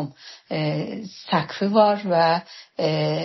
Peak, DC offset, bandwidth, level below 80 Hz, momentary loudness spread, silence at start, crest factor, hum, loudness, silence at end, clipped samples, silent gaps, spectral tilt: -4 dBFS; under 0.1%; 6.2 kHz; -68 dBFS; 16 LU; 0 s; 18 dB; none; -22 LUFS; 0 s; under 0.1%; none; -4.5 dB/octave